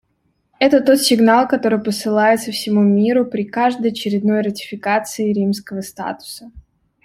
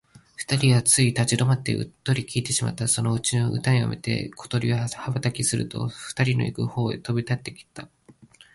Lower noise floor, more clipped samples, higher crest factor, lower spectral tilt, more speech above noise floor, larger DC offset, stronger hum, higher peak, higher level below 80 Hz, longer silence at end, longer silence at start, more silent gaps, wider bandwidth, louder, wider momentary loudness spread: first, -65 dBFS vs -52 dBFS; neither; about the same, 16 dB vs 18 dB; about the same, -5 dB/octave vs -4.5 dB/octave; first, 49 dB vs 29 dB; neither; neither; first, -2 dBFS vs -6 dBFS; about the same, -56 dBFS vs -54 dBFS; second, 0.45 s vs 0.7 s; first, 0.6 s vs 0.4 s; neither; first, 16 kHz vs 11.5 kHz; first, -17 LUFS vs -24 LUFS; first, 14 LU vs 11 LU